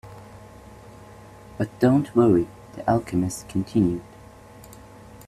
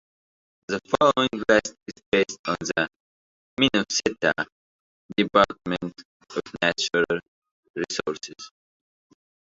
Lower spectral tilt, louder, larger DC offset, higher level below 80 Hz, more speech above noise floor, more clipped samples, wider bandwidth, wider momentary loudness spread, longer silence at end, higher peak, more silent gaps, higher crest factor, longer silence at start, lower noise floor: first, -7.5 dB/octave vs -3.5 dB/octave; about the same, -23 LUFS vs -24 LUFS; neither; first, -50 dBFS vs -58 dBFS; second, 24 dB vs over 66 dB; neither; first, 14.5 kHz vs 8 kHz; first, 26 LU vs 16 LU; second, 0.05 s vs 1 s; about the same, -4 dBFS vs -4 dBFS; second, none vs 2.06-2.12 s, 2.39-2.44 s, 2.96-3.57 s, 4.52-5.09 s, 6.05-6.20 s, 7.28-7.42 s, 7.51-7.63 s, 7.70-7.74 s; about the same, 20 dB vs 24 dB; second, 0.05 s vs 0.7 s; second, -46 dBFS vs under -90 dBFS